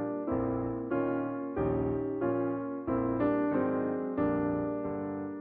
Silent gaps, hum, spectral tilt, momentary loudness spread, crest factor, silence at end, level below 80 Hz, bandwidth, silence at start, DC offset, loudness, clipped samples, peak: none; none; -12.5 dB/octave; 6 LU; 14 dB; 0 s; -54 dBFS; 3.5 kHz; 0 s; under 0.1%; -32 LUFS; under 0.1%; -18 dBFS